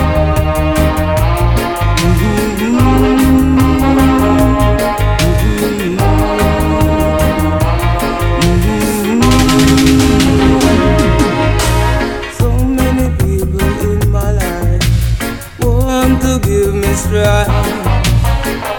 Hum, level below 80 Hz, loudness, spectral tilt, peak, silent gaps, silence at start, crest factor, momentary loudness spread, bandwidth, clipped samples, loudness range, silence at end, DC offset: none; -16 dBFS; -12 LUFS; -6 dB/octave; 0 dBFS; none; 0 s; 10 dB; 5 LU; 19 kHz; under 0.1%; 4 LU; 0 s; under 0.1%